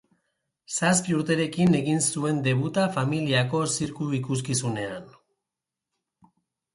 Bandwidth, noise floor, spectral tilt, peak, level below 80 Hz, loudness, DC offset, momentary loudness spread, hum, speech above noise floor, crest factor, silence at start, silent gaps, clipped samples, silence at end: 11.5 kHz; -88 dBFS; -4.5 dB/octave; -8 dBFS; -62 dBFS; -25 LUFS; under 0.1%; 8 LU; none; 63 dB; 18 dB; 0.7 s; none; under 0.1%; 1.65 s